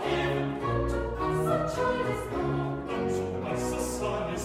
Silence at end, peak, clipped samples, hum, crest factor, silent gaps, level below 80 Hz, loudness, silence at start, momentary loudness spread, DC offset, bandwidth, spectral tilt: 0 s; -14 dBFS; under 0.1%; none; 16 dB; none; -42 dBFS; -30 LUFS; 0 s; 4 LU; under 0.1%; 16 kHz; -6 dB/octave